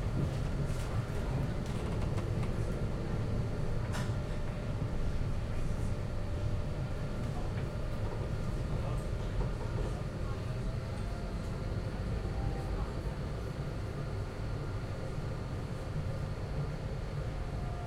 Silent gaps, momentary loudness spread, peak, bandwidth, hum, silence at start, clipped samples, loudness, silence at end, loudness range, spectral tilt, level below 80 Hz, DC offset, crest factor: none; 4 LU; -22 dBFS; 13 kHz; none; 0 s; under 0.1%; -37 LUFS; 0 s; 3 LU; -7 dB/octave; -38 dBFS; under 0.1%; 14 dB